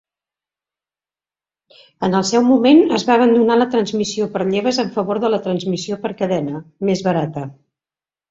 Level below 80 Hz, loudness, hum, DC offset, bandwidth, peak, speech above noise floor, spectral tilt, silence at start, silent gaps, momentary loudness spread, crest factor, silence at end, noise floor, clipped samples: -60 dBFS; -17 LUFS; none; under 0.1%; 7.8 kHz; -2 dBFS; over 74 dB; -5.5 dB/octave; 2 s; none; 11 LU; 16 dB; 0.8 s; under -90 dBFS; under 0.1%